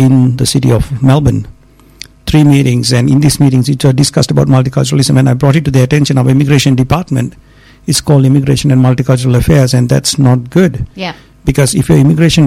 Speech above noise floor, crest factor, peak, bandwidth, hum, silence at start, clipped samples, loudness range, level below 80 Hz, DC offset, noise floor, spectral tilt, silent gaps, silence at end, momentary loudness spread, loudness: 26 dB; 8 dB; 0 dBFS; 15 kHz; none; 0 s; under 0.1%; 1 LU; -30 dBFS; under 0.1%; -34 dBFS; -6 dB/octave; none; 0 s; 8 LU; -9 LUFS